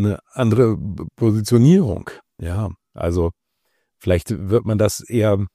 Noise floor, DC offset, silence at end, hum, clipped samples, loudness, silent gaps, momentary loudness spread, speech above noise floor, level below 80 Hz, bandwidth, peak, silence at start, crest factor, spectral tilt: -71 dBFS; under 0.1%; 0.1 s; none; under 0.1%; -19 LUFS; none; 15 LU; 53 dB; -40 dBFS; 15 kHz; -4 dBFS; 0 s; 16 dB; -7.5 dB/octave